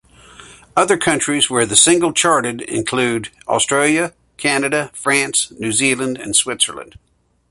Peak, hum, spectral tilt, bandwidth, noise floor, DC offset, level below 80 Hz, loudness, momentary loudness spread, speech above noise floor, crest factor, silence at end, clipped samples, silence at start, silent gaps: 0 dBFS; none; -2 dB/octave; 12 kHz; -42 dBFS; under 0.1%; -54 dBFS; -16 LUFS; 9 LU; 25 dB; 18 dB; 0.7 s; under 0.1%; 0.4 s; none